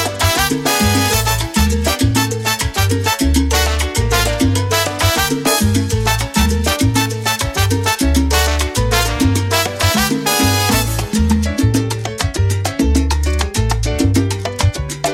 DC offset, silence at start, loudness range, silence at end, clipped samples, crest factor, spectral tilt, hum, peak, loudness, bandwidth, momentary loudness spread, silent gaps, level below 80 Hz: under 0.1%; 0 s; 2 LU; 0 s; under 0.1%; 14 dB; -4 dB/octave; none; -2 dBFS; -15 LUFS; 17 kHz; 4 LU; none; -22 dBFS